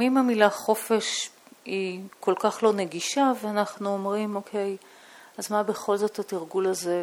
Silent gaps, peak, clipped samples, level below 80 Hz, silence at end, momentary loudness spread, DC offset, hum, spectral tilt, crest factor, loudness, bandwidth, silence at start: none; -4 dBFS; under 0.1%; -78 dBFS; 0 s; 11 LU; under 0.1%; none; -4 dB/octave; 22 dB; -26 LUFS; 18 kHz; 0 s